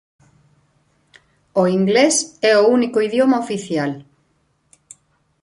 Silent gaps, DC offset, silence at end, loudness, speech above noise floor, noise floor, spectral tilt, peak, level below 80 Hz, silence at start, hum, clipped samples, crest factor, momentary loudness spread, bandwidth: none; under 0.1%; 1.4 s; -17 LUFS; 48 dB; -64 dBFS; -4 dB/octave; -2 dBFS; -64 dBFS; 1.55 s; none; under 0.1%; 16 dB; 9 LU; 11.5 kHz